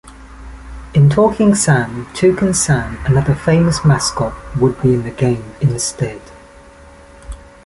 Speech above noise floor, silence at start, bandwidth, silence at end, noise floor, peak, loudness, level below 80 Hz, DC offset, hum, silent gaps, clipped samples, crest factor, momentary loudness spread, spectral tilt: 26 dB; 0.05 s; 11.5 kHz; 0.3 s; -40 dBFS; -2 dBFS; -15 LUFS; -34 dBFS; under 0.1%; none; none; under 0.1%; 14 dB; 21 LU; -5.5 dB/octave